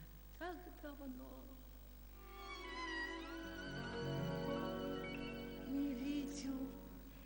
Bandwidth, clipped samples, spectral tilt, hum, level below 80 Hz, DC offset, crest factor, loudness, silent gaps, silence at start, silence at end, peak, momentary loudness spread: 16 kHz; under 0.1%; -5.5 dB/octave; 50 Hz at -60 dBFS; -58 dBFS; under 0.1%; 16 dB; -46 LUFS; none; 0 s; 0 s; -30 dBFS; 14 LU